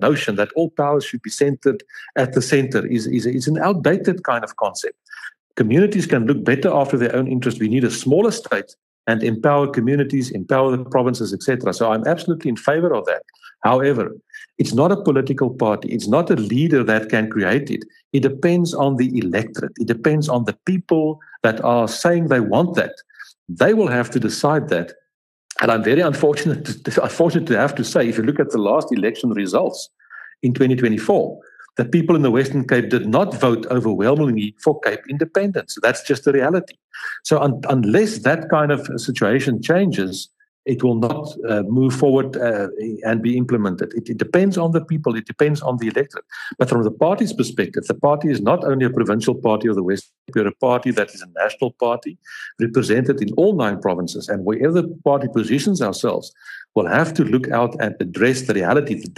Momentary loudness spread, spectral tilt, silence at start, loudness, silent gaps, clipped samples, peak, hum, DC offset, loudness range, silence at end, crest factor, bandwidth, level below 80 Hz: 8 LU; -6.5 dB/octave; 0 s; -19 LUFS; 5.39-5.50 s, 8.78-9.04 s, 18.05-18.11 s, 23.38-23.46 s, 25.14-25.49 s, 36.84-36.89 s, 40.48-40.63 s, 50.18-50.26 s; under 0.1%; -2 dBFS; none; under 0.1%; 2 LU; 0.05 s; 16 dB; 13 kHz; -64 dBFS